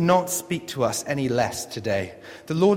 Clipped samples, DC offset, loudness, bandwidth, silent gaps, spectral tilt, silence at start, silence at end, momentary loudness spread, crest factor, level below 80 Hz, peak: under 0.1%; under 0.1%; -25 LUFS; 16.5 kHz; none; -5 dB/octave; 0 s; 0 s; 8 LU; 18 dB; -58 dBFS; -6 dBFS